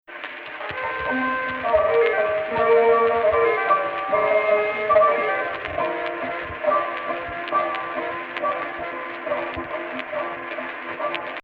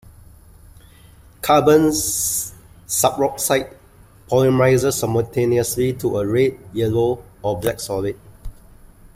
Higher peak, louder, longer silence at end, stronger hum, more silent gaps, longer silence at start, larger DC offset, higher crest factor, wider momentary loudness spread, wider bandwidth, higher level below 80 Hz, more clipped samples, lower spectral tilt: about the same, -4 dBFS vs -2 dBFS; second, -22 LUFS vs -19 LUFS; second, 0.05 s vs 0.65 s; neither; neither; second, 0.1 s vs 1.45 s; neither; about the same, 18 dB vs 18 dB; about the same, 12 LU vs 10 LU; second, 5.2 kHz vs 16 kHz; second, -54 dBFS vs -44 dBFS; neither; first, -7 dB/octave vs -4.5 dB/octave